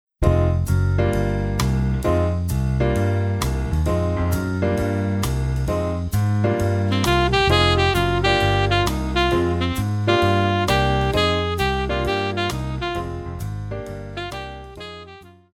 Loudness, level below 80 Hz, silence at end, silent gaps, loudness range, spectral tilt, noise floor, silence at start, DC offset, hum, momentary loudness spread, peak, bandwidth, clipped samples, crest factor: -21 LUFS; -30 dBFS; 0.25 s; none; 6 LU; -6 dB/octave; -43 dBFS; 0.2 s; under 0.1%; none; 12 LU; -4 dBFS; 16.5 kHz; under 0.1%; 16 dB